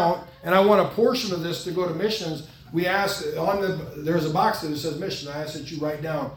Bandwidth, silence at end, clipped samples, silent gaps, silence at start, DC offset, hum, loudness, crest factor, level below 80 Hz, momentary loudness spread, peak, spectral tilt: 18 kHz; 0 s; under 0.1%; none; 0 s; under 0.1%; none; -24 LUFS; 20 dB; -56 dBFS; 11 LU; -4 dBFS; -5 dB/octave